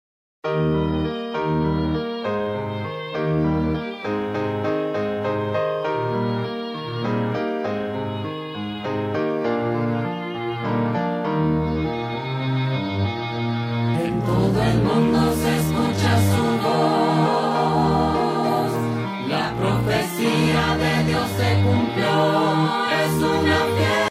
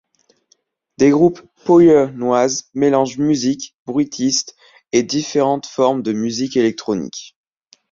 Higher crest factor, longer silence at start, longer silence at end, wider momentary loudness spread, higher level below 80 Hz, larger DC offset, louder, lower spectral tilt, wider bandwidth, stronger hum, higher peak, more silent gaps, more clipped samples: about the same, 14 dB vs 16 dB; second, 0.45 s vs 1 s; second, 0 s vs 0.65 s; second, 8 LU vs 11 LU; first, -42 dBFS vs -56 dBFS; neither; second, -22 LUFS vs -16 LUFS; first, -6.5 dB/octave vs -5 dB/octave; first, 16 kHz vs 7.6 kHz; neither; second, -8 dBFS vs -2 dBFS; second, none vs 3.79-3.86 s; neither